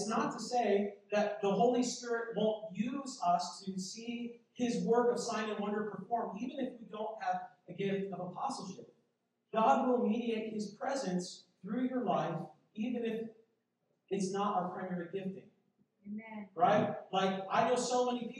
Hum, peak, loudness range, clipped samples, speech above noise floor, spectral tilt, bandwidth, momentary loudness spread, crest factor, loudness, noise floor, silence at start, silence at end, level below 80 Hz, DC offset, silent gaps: none; -16 dBFS; 5 LU; under 0.1%; 46 dB; -5 dB/octave; 11 kHz; 13 LU; 20 dB; -35 LUFS; -81 dBFS; 0 s; 0 s; -86 dBFS; under 0.1%; none